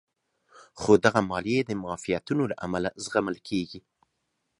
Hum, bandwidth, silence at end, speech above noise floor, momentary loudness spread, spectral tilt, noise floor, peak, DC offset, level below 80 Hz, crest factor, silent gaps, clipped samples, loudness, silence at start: none; 11.5 kHz; 0.8 s; 52 dB; 11 LU; -5.5 dB/octave; -78 dBFS; -4 dBFS; under 0.1%; -58 dBFS; 24 dB; none; under 0.1%; -27 LUFS; 0.75 s